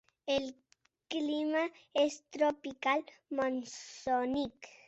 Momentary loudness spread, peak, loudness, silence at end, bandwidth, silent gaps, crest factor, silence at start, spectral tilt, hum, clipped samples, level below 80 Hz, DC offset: 8 LU; -16 dBFS; -34 LUFS; 0.15 s; 8.2 kHz; none; 18 dB; 0.25 s; -3.5 dB/octave; none; under 0.1%; -70 dBFS; under 0.1%